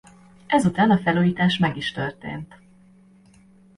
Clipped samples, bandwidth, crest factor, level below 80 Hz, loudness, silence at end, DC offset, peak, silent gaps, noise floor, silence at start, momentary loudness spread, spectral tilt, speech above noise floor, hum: under 0.1%; 11.5 kHz; 18 dB; -54 dBFS; -21 LUFS; 1.3 s; under 0.1%; -4 dBFS; none; -53 dBFS; 0.5 s; 16 LU; -6.5 dB/octave; 32 dB; none